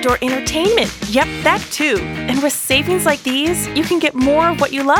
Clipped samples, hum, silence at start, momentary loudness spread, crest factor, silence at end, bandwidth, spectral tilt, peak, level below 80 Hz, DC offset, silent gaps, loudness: under 0.1%; none; 0 s; 4 LU; 14 dB; 0 s; over 20 kHz; -3.5 dB/octave; -2 dBFS; -38 dBFS; under 0.1%; none; -16 LUFS